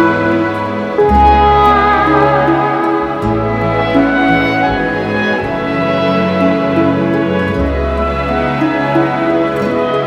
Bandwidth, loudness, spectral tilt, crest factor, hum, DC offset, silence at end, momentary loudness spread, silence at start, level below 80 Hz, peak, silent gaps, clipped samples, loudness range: 10 kHz; -12 LUFS; -7.5 dB/octave; 12 dB; none; under 0.1%; 0 s; 7 LU; 0 s; -26 dBFS; 0 dBFS; none; under 0.1%; 3 LU